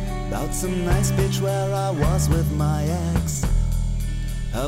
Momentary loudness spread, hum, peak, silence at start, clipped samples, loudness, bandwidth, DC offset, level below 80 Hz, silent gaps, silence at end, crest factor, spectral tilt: 7 LU; none; -8 dBFS; 0 s; under 0.1%; -23 LUFS; 16 kHz; under 0.1%; -26 dBFS; none; 0 s; 14 dB; -6 dB/octave